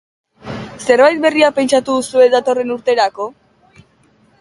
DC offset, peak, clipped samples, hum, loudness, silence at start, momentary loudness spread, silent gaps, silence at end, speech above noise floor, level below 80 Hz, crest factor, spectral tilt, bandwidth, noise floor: under 0.1%; 0 dBFS; under 0.1%; none; -13 LUFS; 0.45 s; 16 LU; none; 1.1 s; 40 dB; -54 dBFS; 16 dB; -3.5 dB/octave; 11.5 kHz; -53 dBFS